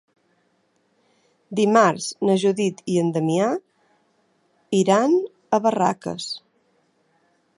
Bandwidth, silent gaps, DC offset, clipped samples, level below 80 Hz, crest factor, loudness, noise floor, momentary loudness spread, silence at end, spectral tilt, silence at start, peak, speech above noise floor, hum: 11.5 kHz; none; under 0.1%; under 0.1%; -70 dBFS; 20 dB; -21 LUFS; -66 dBFS; 12 LU; 1.2 s; -5.5 dB/octave; 1.5 s; -2 dBFS; 46 dB; none